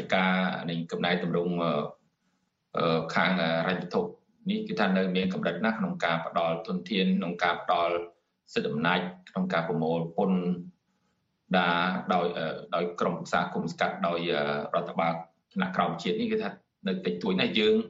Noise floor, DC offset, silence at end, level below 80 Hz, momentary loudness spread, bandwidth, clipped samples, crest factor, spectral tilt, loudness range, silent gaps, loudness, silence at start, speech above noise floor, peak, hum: -75 dBFS; under 0.1%; 0 s; -68 dBFS; 8 LU; 7.8 kHz; under 0.1%; 20 dB; -6.5 dB/octave; 2 LU; none; -29 LUFS; 0 s; 47 dB; -8 dBFS; none